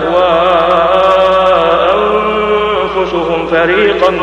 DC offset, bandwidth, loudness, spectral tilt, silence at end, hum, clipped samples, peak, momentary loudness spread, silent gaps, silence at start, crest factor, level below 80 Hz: under 0.1%; 8.4 kHz; -10 LUFS; -5.5 dB/octave; 0 s; none; 0.2%; 0 dBFS; 5 LU; none; 0 s; 10 dB; -36 dBFS